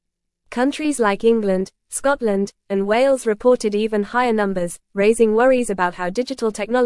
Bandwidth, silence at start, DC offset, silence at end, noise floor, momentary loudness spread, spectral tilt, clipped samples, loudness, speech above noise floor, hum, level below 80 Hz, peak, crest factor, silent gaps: 12 kHz; 0.5 s; under 0.1%; 0 s; -65 dBFS; 8 LU; -5 dB/octave; under 0.1%; -19 LUFS; 47 dB; none; -50 dBFS; -4 dBFS; 16 dB; none